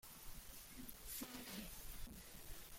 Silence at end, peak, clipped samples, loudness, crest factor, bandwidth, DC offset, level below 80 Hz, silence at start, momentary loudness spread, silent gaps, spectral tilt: 0 s; -36 dBFS; under 0.1%; -53 LUFS; 18 dB; 16.5 kHz; under 0.1%; -60 dBFS; 0.05 s; 7 LU; none; -2.5 dB/octave